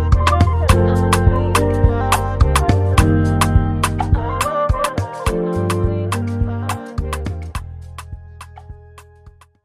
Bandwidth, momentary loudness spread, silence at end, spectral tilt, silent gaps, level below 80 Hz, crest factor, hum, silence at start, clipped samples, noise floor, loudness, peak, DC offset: 15 kHz; 18 LU; 0.35 s; -6 dB/octave; none; -24 dBFS; 16 dB; none; 0 s; under 0.1%; -45 dBFS; -17 LUFS; 0 dBFS; under 0.1%